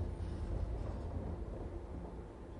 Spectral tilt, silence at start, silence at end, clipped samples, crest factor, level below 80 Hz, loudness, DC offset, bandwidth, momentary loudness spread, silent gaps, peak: -8.5 dB/octave; 0 s; 0 s; under 0.1%; 14 dB; -44 dBFS; -44 LUFS; under 0.1%; 10.5 kHz; 6 LU; none; -28 dBFS